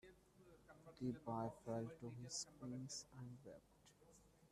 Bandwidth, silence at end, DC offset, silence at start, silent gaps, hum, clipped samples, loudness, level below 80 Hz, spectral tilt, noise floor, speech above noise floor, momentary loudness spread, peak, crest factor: 13.5 kHz; 0.05 s; under 0.1%; 0.05 s; none; none; under 0.1%; -51 LUFS; -78 dBFS; -5 dB/octave; -71 dBFS; 20 dB; 20 LU; -34 dBFS; 18 dB